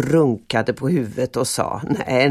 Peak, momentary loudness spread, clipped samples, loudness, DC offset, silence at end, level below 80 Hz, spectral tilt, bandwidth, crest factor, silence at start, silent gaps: -4 dBFS; 5 LU; under 0.1%; -21 LUFS; under 0.1%; 0 s; -50 dBFS; -5.5 dB/octave; 15 kHz; 16 dB; 0 s; none